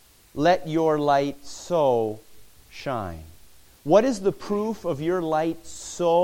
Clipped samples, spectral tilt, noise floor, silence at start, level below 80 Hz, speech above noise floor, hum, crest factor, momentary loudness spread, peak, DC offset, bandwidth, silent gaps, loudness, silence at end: under 0.1%; -5.5 dB/octave; -53 dBFS; 0.35 s; -54 dBFS; 30 dB; none; 20 dB; 17 LU; -4 dBFS; under 0.1%; 17 kHz; none; -24 LUFS; 0 s